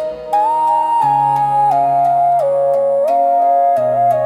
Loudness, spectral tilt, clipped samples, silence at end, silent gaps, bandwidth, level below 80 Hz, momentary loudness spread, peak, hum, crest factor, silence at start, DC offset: -14 LUFS; -6.5 dB/octave; under 0.1%; 0 s; none; 12.5 kHz; -58 dBFS; 2 LU; -6 dBFS; none; 8 dB; 0 s; under 0.1%